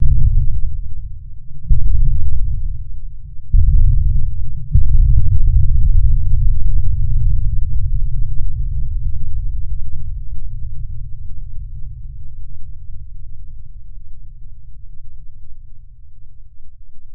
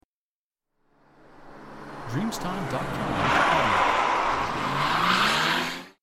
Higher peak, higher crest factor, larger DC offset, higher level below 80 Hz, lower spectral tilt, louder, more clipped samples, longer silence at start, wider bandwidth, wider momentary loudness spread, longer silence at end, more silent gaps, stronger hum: first, 0 dBFS vs -10 dBFS; second, 10 dB vs 18 dB; neither; first, -16 dBFS vs -48 dBFS; first, -16.5 dB/octave vs -4 dB/octave; first, -21 LUFS vs -24 LUFS; neither; second, 0 s vs 1.4 s; second, 0.4 kHz vs 16 kHz; first, 23 LU vs 12 LU; second, 0 s vs 0.15 s; neither; neither